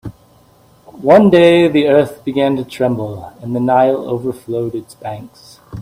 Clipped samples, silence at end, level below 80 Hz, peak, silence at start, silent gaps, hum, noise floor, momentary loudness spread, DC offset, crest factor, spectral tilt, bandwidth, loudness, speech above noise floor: under 0.1%; 0 s; -50 dBFS; 0 dBFS; 0.05 s; none; none; -48 dBFS; 19 LU; under 0.1%; 14 dB; -7 dB/octave; 15.5 kHz; -13 LUFS; 35 dB